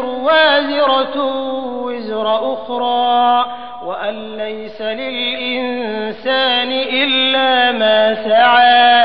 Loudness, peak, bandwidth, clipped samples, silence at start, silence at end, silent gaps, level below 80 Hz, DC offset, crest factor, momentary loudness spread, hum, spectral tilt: -14 LUFS; -2 dBFS; 5.2 kHz; under 0.1%; 0 s; 0 s; none; -58 dBFS; 1%; 12 dB; 13 LU; none; -7 dB/octave